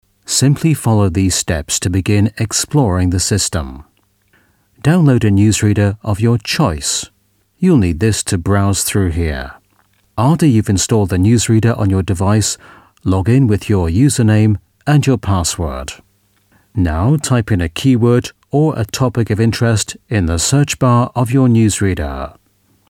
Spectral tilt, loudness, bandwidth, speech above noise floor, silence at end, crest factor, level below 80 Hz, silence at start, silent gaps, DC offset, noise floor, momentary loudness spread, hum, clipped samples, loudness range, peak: -5.5 dB/octave; -14 LUFS; 16 kHz; 45 dB; 0.6 s; 14 dB; -32 dBFS; 0.3 s; none; under 0.1%; -58 dBFS; 8 LU; none; under 0.1%; 2 LU; 0 dBFS